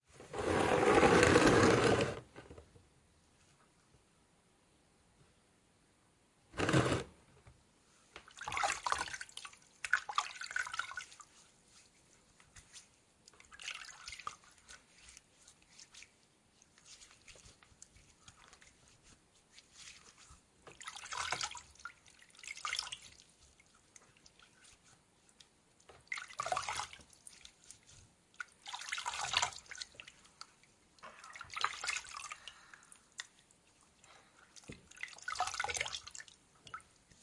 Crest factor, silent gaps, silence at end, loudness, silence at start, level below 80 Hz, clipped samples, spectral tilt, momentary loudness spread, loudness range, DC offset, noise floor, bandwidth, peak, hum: 28 dB; none; 0.45 s; -35 LUFS; 0.2 s; -62 dBFS; under 0.1%; -4 dB/octave; 27 LU; 21 LU; under 0.1%; -71 dBFS; 11.5 kHz; -12 dBFS; none